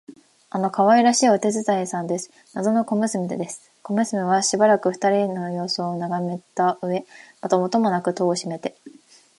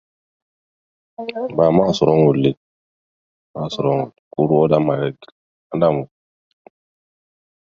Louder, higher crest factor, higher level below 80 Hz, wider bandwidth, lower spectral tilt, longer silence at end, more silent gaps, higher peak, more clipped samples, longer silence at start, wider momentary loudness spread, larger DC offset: second, -22 LUFS vs -18 LUFS; about the same, 18 dB vs 20 dB; second, -74 dBFS vs -54 dBFS; first, 11.5 kHz vs 7.4 kHz; second, -4.5 dB/octave vs -7.5 dB/octave; second, 0.5 s vs 1.6 s; second, none vs 2.57-3.54 s, 4.19-4.31 s, 5.32-5.70 s; second, -4 dBFS vs 0 dBFS; neither; second, 0.1 s vs 1.2 s; about the same, 13 LU vs 15 LU; neither